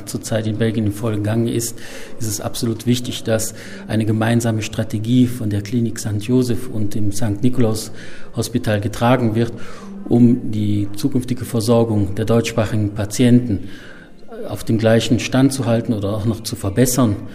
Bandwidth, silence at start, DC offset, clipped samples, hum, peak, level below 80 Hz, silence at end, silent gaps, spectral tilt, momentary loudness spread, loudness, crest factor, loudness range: 16 kHz; 0 s; under 0.1%; under 0.1%; none; -2 dBFS; -42 dBFS; 0 s; none; -6 dB/octave; 11 LU; -19 LUFS; 16 dB; 3 LU